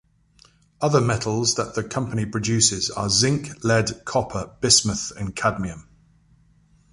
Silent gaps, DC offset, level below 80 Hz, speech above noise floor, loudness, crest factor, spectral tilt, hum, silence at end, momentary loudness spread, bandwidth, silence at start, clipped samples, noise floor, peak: none; under 0.1%; -48 dBFS; 35 dB; -21 LUFS; 22 dB; -3.5 dB/octave; none; 1.1 s; 11 LU; 11.5 kHz; 0.8 s; under 0.1%; -57 dBFS; -2 dBFS